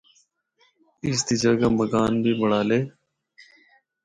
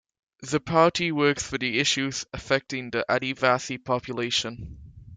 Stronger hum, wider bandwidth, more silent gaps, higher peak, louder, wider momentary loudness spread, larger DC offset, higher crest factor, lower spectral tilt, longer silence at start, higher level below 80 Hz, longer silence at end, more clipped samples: neither; about the same, 10.5 kHz vs 9.6 kHz; neither; about the same, -8 dBFS vs -6 dBFS; first, -22 LUFS vs -25 LUFS; second, 6 LU vs 10 LU; neither; about the same, 16 dB vs 20 dB; first, -5 dB/octave vs -3.5 dB/octave; first, 1.05 s vs 0.4 s; about the same, -54 dBFS vs -54 dBFS; first, 1.15 s vs 0 s; neither